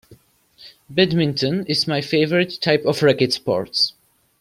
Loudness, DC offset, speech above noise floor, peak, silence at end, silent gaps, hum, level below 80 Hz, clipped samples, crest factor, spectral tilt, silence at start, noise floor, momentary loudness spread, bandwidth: -19 LUFS; under 0.1%; 33 dB; -2 dBFS; 0.5 s; none; none; -58 dBFS; under 0.1%; 18 dB; -5.5 dB/octave; 0.1 s; -52 dBFS; 4 LU; 16 kHz